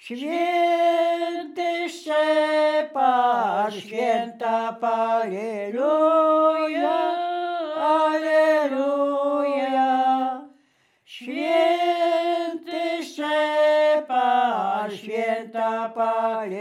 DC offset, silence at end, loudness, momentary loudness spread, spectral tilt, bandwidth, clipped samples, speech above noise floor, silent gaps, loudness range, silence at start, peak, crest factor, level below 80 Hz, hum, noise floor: under 0.1%; 0 s; -22 LUFS; 9 LU; -4.5 dB/octave; 12.5 kHz; under 0.1%; 41 dB; none; 2 LU; 0.05 s; -8 dBFS; 14 dB; under -90 dBFS; none; -64 dBFS